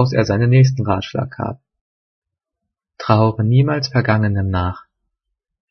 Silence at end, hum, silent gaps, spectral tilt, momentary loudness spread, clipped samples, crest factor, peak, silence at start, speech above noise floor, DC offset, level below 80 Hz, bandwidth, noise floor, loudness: 0.9 s; none; 1.81-2.22 s; -7.5 dB/octave; 14 LU; under 0.1%; 18 dB; 0 dBFS; 0 s; 65 dB; under 0.1%; -48 dBFS; 6.4 kHz; -81 dBFS; -17 LUFS